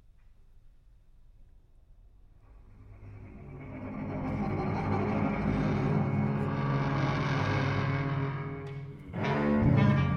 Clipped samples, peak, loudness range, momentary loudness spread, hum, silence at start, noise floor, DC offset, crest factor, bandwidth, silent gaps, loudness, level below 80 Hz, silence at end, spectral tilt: under 0.1%; -14 dBFS; 12 LU; 18 LU; none; 0.3 s; -57 dBFS; under 0.1%; 18 dB; 6.6 kHz; none; -30 LUFS; -48 dBFS; 0 s; -8.5 dB/octave